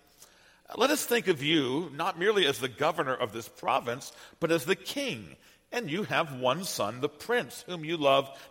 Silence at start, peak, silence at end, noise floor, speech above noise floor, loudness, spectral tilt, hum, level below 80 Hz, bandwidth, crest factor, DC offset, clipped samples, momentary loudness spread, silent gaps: 0.2 s; -10 dBFS; 0.05 s; -58 dBFS; 28 dB; -29 LUFS; -3.5 dB/octave; none; -70 dBFS; 16.5 kHz; 20 dB; under 0.1%; under 0.1%; 11 LU; none